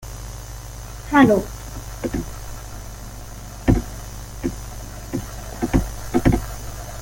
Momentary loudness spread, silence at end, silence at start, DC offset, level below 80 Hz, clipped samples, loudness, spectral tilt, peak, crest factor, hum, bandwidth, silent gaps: 19 LU; 0 s; 0 s; under 0.1%; -32 dBFS; under 0.1%; -22 LUFS; -6 dB/octave; -2 dBFS; 20 dB; none; 17 kHz; none